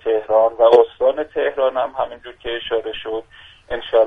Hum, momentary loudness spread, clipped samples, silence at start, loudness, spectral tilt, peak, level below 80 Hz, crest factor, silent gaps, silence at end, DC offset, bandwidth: none; 16 LU; under 0.1%; 0.05 s; -18 LUFS; -5.5 dB/octave; 0 dBFS; -48 dBFS; 18 dB; none; 0 s; under 0.1%; 5 kHz